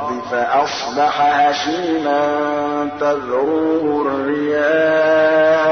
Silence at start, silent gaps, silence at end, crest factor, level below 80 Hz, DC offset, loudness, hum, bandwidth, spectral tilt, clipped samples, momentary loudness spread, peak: 0 s; none; 0 s; 12 dB; -58 dBFS; under 0.1%; -16 LUFS; none; 6.6 kHz; -4.5 dB/octave; under 0.1%; 6 LU; -4 dBFS